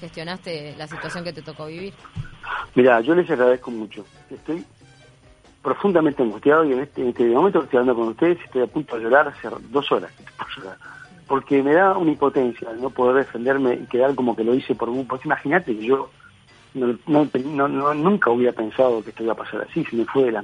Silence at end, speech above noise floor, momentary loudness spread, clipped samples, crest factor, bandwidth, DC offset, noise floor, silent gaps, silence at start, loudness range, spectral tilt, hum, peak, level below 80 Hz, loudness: 0 s; 31 dB; 16 LU; under 0.1%; 20 dB; 10 kHz; under 0.1%; -51 dBFS; none; 0 s; 3 LU; -7 dB/octave; none; -2 dBFS; -56 dBFS; -20 LUFS